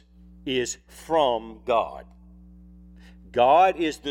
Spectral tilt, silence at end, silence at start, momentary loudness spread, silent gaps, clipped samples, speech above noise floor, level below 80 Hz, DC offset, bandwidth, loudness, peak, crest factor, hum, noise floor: -3.5 dB/octave; 0 s; 0.45 s; 18 LU; none; under 0.1%; 25 dB; -50 dBFS; under 0.1%; 15 kHz; -23 LUFS; -6 dBFS; 18 dB; none; -48 dBFS